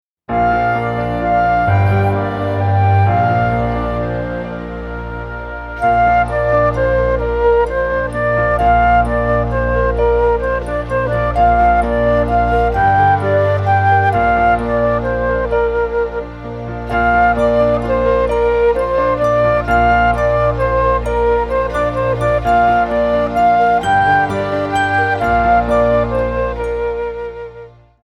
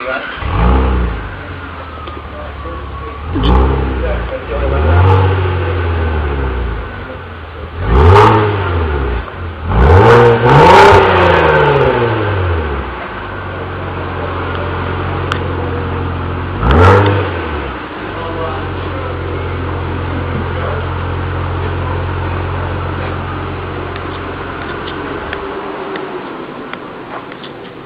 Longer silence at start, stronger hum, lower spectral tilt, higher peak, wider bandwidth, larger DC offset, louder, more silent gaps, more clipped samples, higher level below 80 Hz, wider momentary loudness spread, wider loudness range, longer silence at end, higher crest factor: first, 0.3 s vs 0 s; first, 60 Hz at -40 dBFS vs none; about the same, -8 dB/octave vs -7.5 dB/octave; about the same, -2 dBFS vs 0 dBFS; first, 11.5 kHz vs 8.6 kHz; neither; about the same, -14 LUFS vs -13 LUFS; neither; second, under 0.1% vs 0.2%; about the same, -26 dBFS vs -22 dBFS; second, 8 LU vs 18 LU; second, 3 LU vs 13 LU; first, 0.35 s vs 0 s; about the same, 12 dB vs 14 dB